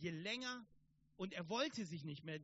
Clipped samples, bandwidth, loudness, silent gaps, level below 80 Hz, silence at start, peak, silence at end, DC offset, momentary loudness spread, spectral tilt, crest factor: under 0.1%; 8 kHz; -45 LUFS; none; -82 dBFS; 0 s; -28 dBFS; 0 s; under 0.1%; 8 LU; -3.5 dB/octave; 18 dB